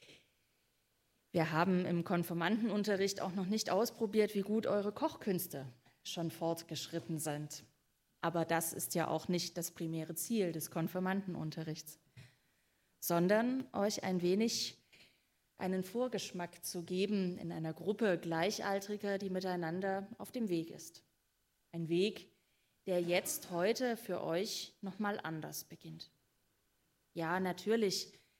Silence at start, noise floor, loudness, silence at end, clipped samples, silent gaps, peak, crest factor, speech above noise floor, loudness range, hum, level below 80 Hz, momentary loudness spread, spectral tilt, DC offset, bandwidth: 0.1 s; -80 dBFS; -37 LUFS; 0.25 s; under 0.1%; none; -16 dBFS; 22 dB; 43 dB; 5 LU; none; -80 dBFS; 11 LU; -4.5 dB/octave; under 0.1%; 16 kHz